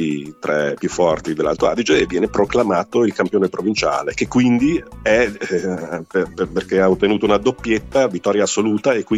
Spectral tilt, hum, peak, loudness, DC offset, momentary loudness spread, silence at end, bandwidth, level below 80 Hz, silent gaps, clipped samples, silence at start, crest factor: -5 dB/octave; none; -2 dBFS; -18 LUFS; under 0.1%; 6 LU; 0 s; 12 kHz; -44 dBFS; none; under 0.1%; 0 s; 16 dB